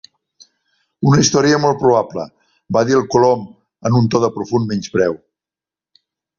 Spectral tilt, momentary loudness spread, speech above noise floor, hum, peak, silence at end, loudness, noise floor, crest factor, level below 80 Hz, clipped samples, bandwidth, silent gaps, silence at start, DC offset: -5.5 dB/octave; 13 LU; 75 dB; none; -2 dBFS; 1.25 s; -16 LUFS; -89 dBFS; 16 dB; -52 dBFS; under 0.1%; 7.4 kHz; none; 1 s; under 0.1%